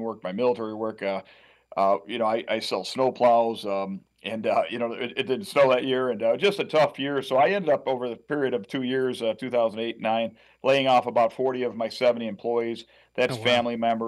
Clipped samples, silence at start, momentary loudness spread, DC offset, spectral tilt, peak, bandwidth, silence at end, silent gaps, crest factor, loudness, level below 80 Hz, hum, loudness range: under 0.1%; 0 s; 9 LU; under 0.1%; -5 dB/octave; -8 dBFS; 12.5 kHz; 0 s; none; 16 dB; -25 LUFS; -72 dBFS; none; 2 LU